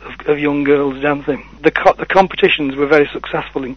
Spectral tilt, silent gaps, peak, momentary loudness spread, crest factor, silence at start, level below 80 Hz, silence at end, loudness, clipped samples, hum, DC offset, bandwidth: -6.5 dB/octave; none; 0 dBFS; 9 LU; 16 dB; 0 s; -42 dBFS; 0 s; -15 LUFS; 0.2%; none; under 0.1%; 6.4 kHz